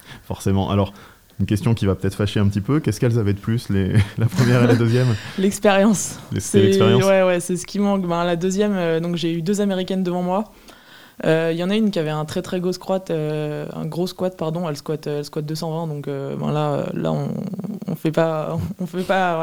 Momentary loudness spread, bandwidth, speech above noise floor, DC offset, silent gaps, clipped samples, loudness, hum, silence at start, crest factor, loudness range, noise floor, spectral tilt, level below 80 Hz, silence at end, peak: 11 LU; 17 kHz; 26 dB; 0.3%; none; under 0.1%; -21 LUFS; none; 0.05 s; 18 dB; 7 LU; -45 dBFS; -6 dB/octave; -52 dBFS; 0 s; -2 dBFS